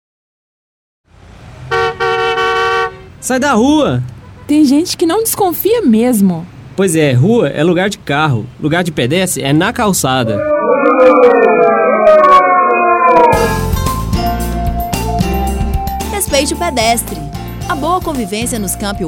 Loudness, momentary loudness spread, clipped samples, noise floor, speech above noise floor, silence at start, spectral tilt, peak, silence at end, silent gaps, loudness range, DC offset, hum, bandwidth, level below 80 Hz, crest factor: -12 LUFS; 10 LU; 0.2%; -36 dBFS; 25 dB; 1.3 s; -5 dB/octave; 0 dBFS; 0 s; none; 7 LU; under 0.1%; none; over 20 kHz; -28 dBFS; 12 dB